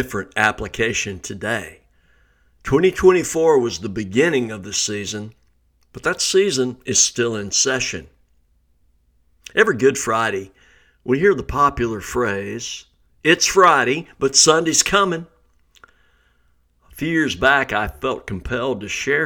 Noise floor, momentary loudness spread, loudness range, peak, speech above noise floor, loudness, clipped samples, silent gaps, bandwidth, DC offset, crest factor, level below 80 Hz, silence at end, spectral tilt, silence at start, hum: -60 dBFS; 14 LU; 6 LU; 0 dBFS; 42 dB; -18 LUFS; under 0.1%; none; 19 kHz; under 0.1%; 20 dB; -44 dBFS; 0 s; -3 dB/octave; 0 s; none